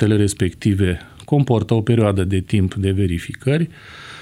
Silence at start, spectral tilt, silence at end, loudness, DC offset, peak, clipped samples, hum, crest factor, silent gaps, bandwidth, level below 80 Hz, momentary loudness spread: 0 s; -7 dB/octave; 0 s; -19 LUFS; under 0.1%; -2 dBFS; under 0.1%; none; 16 dB; none; 12.5 kHz; -42 dBFS; 7 LU